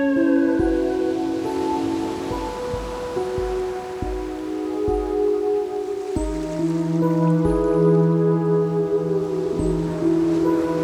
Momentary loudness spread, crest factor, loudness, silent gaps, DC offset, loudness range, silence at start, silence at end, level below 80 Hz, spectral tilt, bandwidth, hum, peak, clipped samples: 9 LU; 14 dB; -22 LUFS; none; under 0.1%; 6 LU; 0 s; 0 s; -38 dBFS; -8 dB/octave; 12.5 kHz; none; -8 dBFS; under 0.1%